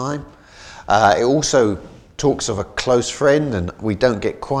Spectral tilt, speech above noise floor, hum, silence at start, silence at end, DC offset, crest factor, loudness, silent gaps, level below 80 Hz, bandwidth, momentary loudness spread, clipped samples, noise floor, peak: -4.5 dB/octave; 23 dB; none; 0 s; 0 s; under 0.1%; 18 dB; -18 LUFS; none; -42 dBFS; 12.5 kHz; 12 LU; under 0.1%; -40 dBFS; 0 dBFS